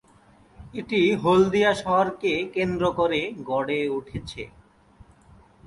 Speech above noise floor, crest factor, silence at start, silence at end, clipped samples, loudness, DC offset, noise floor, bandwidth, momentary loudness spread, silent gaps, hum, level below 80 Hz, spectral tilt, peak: 32 dB; 18 dB; 0.6 s; 0 s; under 0.1%; -23 LUFS; under 0.1%; -55 dBFS; 11.5 kHz; 18 LU; none; none; -52 dBFS; -6 dB/octave; -6 dBFS